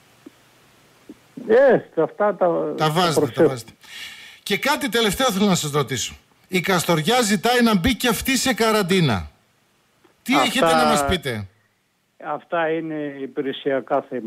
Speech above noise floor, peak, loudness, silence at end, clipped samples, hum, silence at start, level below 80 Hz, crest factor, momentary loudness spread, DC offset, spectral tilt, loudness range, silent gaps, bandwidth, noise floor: 47 dB; -8 dBFS; -20 LUFS; 0 s; under 0.1%; none; 1.1 s; -46 dBFS; 14 dB; 16 LU; under 0.1%; -4 dB/octave; 3 LU; none; 16 kHz; -66 dBFS